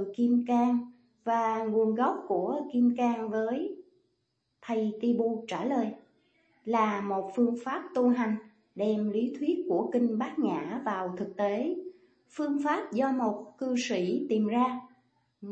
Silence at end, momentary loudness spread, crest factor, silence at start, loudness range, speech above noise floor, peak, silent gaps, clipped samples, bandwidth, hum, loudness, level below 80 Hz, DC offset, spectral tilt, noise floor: 0 s; 10 LU; 16 dB; 0 s; 3 LU; 49 dB; -14 dBFS; none; under 0.1%; 8.2 kHz; none; -30 LUFS; -80 dBFS; under 0.1%; -6.5 dB/octave; -78 dBFS